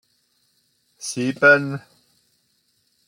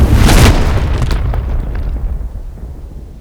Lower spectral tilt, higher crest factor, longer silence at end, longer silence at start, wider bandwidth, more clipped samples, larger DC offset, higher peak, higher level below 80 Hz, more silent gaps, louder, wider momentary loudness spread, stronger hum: about the same, -4.5 dB/octave vs -5.5 dB/octave; first, 20 dB vs 12 dB; first, 1.3 s vs 0 s; first, 1 s vs 0 s; second, 15.5 kHz vs 19 kHz; second, under 0.1% vs 0.2%; second, under 0.1% vs 0.4%; second, -4 dBFS vs 0 dBFS; second, -72 dBFS vs -14 dBFS; neither; second, -18 LUFS vs -13 LUFS; about the same, 19 LU vs 21 LU; neither